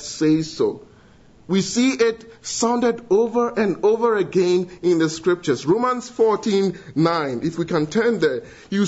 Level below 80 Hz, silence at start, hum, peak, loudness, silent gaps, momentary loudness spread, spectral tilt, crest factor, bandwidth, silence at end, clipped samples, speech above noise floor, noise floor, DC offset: -58 dBFS; 0 s; none; -4 dBFS; -20 LUFS; none; 5 LU; -5 dB/octave; 16 dB; 8 kHz; 0 s; under 0.1%; 30 dB; -49 dBFS; under 0.1%